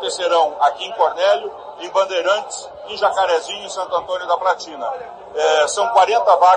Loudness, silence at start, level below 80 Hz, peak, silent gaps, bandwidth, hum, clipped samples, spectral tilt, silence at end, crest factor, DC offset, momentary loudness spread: -18 LUFS; 0 s; -62 dBFS; -2 dBFS; none; 11 kHz; none; under 0.1%; -0.5 dB/octave; 0 s; 16 dB; under 0.1%; 15 LU